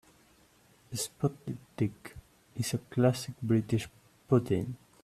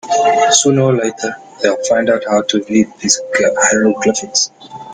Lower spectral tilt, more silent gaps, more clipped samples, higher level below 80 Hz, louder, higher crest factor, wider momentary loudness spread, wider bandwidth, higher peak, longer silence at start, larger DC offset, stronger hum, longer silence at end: first, -6 dB/octave vs -3 dB/octave; neither; neither; second, -62 dBFS vs -56 dBFS; second, -32 LUFS vs -13 LUFS; first, 20 dB vs 14 dB; first, 15 LU vs 9 LU; about the same, 14.5 kHz vs 15.5 kHz; second, -12 dBFS vs 0 dBFS; first, 0.9 s vs 0.05 s; neither; neither; first, 0.3 s vs 0 s